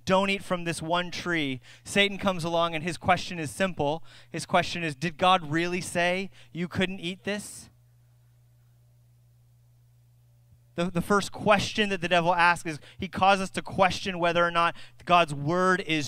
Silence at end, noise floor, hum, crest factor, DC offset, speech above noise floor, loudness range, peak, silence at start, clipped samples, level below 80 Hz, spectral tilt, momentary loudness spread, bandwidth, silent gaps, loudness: 0 s; -59 dBFS; none; 22 dB; under 0.1%; 33 dB; 11 LU; -6 dBFS; 0.05 s; under 0.1%; -54 dBFS; -4.5 dB/octave; 12 LU; 16 kHz; none; -26 LUFS